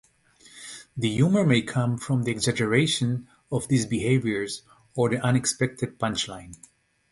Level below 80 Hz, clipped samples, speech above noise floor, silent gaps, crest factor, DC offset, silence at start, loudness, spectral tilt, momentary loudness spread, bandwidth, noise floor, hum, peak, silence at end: -56 dBFS; under 0.1%; 32 dB; none; 20 dB; under 0.1%; 0.55 s; -25 LUFS; -5 dB/octave; 15 LU; 11.5 kHz; -56 dBFS; none; -6 dBFS; 0.55 s